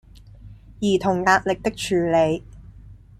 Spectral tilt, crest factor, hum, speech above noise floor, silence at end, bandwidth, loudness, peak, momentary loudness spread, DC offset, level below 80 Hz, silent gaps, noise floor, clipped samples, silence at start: -5 dB/octave; 20 dB; none; 24 dB; 0.25 s; 14.5 kHz; -21 LUFS; -2 dBFS; 7 LU; under 0.1%; -46 dBFS; none; -44 dBFS; under 0.1%; 0.45 s